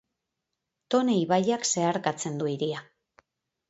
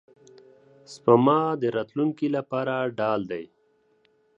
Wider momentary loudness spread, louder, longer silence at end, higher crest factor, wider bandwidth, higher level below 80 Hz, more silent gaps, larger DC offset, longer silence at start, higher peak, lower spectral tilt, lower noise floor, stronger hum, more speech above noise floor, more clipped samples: second, 7 LU vs 12 LU; second, -27 LUFS vs -24 LUFS; about the same, 0.85 s vs 0.95 s; about the same, 18 dB vs 22 dB; about the same, 8.2 kHz vs 8.2 kHz; about the same, -74 dBFS vs -72 dBFS; neither; neither; about the same, 0.9 s vs 0.9 s; second, -10 dBFS vs -4 dBFS; second, -4.5 dB/octave vs -7.5 dB/octave; first, -84 dBFS vs -65 dBFS; neither; first, 58 dB vs 41 dB; neither